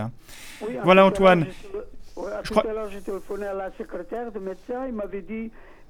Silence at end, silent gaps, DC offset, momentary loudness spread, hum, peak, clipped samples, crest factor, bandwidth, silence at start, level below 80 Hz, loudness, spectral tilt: 0.05 s; none; under 0.1%; 21 LU; none; -4 dBFS; under 0.1%; 22 dB; 16 kHz; 0 s; -46 dBFS; -23 LUFS; -6.5 dB/octave